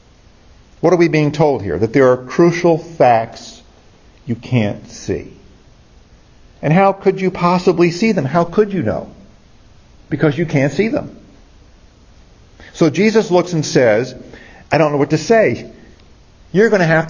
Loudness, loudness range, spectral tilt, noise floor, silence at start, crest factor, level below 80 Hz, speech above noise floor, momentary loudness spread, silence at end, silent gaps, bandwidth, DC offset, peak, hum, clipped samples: -15 LUFS; 7 LU; -6.5 dB/octave; -46 dBFS; 0.8 s; 16 dB; -46 dBFS; 32 dB; 14 LU; 0 s; none; 7.6 kHz; under 0.1%; 0 dBFS; none; under 0.1%